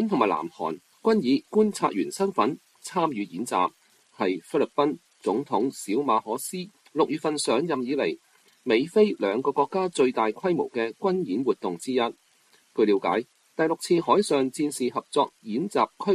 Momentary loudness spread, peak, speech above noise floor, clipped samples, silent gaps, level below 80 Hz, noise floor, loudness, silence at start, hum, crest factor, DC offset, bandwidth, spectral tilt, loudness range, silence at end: 9 LU; -6 dBFS; 37 dB; under 0.1%; none; -72 dBFS; -62 dBFS; -26 LUFS; 0 s; none; 18 dB; under 0.1%; 13 kHz; -5 dB/octave; 2 LU; 0 s